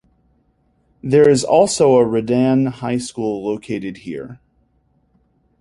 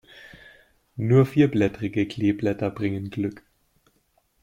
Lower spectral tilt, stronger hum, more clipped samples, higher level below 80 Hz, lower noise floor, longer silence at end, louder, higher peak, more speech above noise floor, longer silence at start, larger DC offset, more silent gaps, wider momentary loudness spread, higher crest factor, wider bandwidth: second, -5.5 dB/octave vs -8.5 dB/octave; neither; neither; about the same, -54 dBFS vs -56 dBFS; second, -61 dBFS vs -67 dBFS; first, 1.25 s vs 1.05 s; first, -16 LUFS vs -24 LUFS; first, -2 dBFS vs -6 dBFS; about the same, 45 dB vs 45 dB; first, 1.05 s vs 0.25 s; neither; neither; first, 17 LU vs 12 LU; about the same, 16 dB vs 18 dB; second, 11.5 kHz vs 13.5 kHz